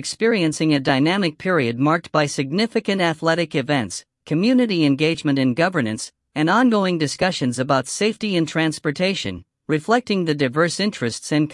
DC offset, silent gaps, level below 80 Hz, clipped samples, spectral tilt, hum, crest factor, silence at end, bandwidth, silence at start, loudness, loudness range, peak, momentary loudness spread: under 0.1%; none; -60 dBFS; under 0.1%; -5 dB/octave; none; 16 dB; 0 s; 12 kHz; 0 s; -20 LUFS; 2 LU; -4 dBFS; 7 LU